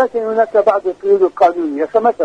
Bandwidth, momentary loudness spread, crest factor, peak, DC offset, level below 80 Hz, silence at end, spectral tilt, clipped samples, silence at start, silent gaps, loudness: 8.6 kHz; 4 LU; 14 dB; 0 dBFS; under 0.1%; -58 dBFS; 0 s; -6.5 dB/octave; under 0.1%; 0 s; none; -14 LUFS